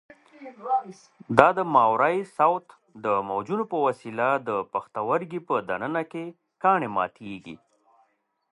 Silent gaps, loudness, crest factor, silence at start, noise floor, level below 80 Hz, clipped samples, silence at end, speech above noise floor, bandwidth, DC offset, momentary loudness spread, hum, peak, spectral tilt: none; -25 LUFS; 26 dB; 0.4 s; -69 dBFS; -66 dBFS; under 0.1%; 0.95 s; 44 dB; 11.5 kHz; under 0.1%; 20 LU; none; 0 dBFS; -7 dB/octave